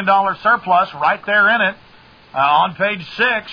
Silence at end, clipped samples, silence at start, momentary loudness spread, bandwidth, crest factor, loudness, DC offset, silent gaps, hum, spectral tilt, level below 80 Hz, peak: 0 s; under 0.1%; 0 s; 6 LU; 5.4 kHz; 14 dB; -15 LUFS; under 0.1%; none; none; -6 dB/octave; -58 dBFS; -2 dBFS